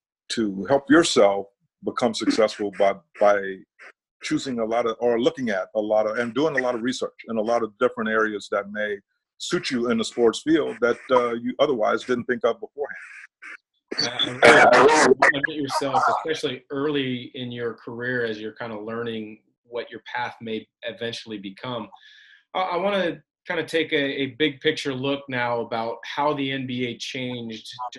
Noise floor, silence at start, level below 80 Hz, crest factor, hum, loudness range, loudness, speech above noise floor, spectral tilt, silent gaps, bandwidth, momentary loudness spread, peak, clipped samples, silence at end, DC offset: -44 dBFS; 0.3 s; -62 dBFS; 24 dB; none; 12 LU; -23 LUFS; 21 dB; -4 dB/octave; 4.11-4.20 s, 19.58-19.64 s; 12 kHz; 16 LU; 0 dBFS; under 0.1%; 0 s; under 0.1%